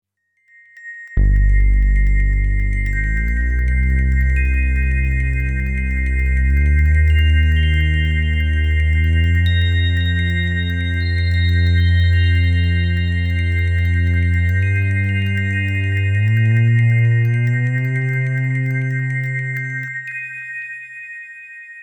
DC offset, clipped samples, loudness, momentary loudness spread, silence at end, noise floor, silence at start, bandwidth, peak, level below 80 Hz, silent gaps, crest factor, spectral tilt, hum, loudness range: under 0.1%; under 0.1%; -17 LUFS; 10 LU; 0 s; -59 dBFS; 0.75 s; 7.2 kHz; -6 dBFS; -20 dBFS; none; 10 dB; -7 dB/octave; none; 3 LU